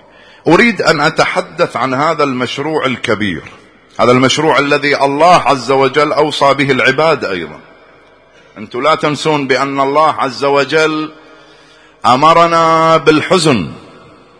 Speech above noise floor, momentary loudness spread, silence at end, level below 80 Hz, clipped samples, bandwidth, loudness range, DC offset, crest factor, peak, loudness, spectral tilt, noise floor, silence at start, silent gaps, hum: 33 dB; 9 LU; 0.55 s; -48 dBFS; 0.4%; 11 kHz; 4 LU; under 0.1%; 12 dB; 0 dBFS; -11 LUFS; -4.5 dB/octave; -44 dBFS; 0.45 s; none; none